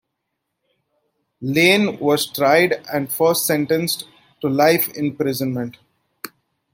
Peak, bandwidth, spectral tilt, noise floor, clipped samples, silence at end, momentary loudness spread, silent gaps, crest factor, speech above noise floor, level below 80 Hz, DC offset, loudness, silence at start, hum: -2 dBFS; 17 kHz; -4 dB/octave; -77 dBFS; under 0.1%; 0.45 s; 17 LU; none; 18 dB; 59 dB; -64 dBFS; under 0.1%; -18 LUFS; 1.4 s; none